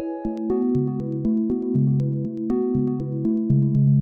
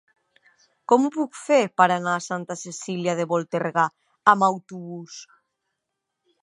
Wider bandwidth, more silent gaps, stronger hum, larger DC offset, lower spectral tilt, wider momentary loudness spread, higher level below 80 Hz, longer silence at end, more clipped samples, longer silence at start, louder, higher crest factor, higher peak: second, 2 kHz vs 11 kHz; neither; neither; neither; first, -13 dB/octave vs -5 dB/octave; second, 6 LU vs 18 LU; first, -46 dBFS vs -78 dBFS; second, 0 s vs 1.2 s; neither; second, 0 s vs 0.9 s; about the same, -23 LUFS vs -22 LUFS; second, 12 dB vs 24 dB; second, -10 dBFS vs -2 dBFS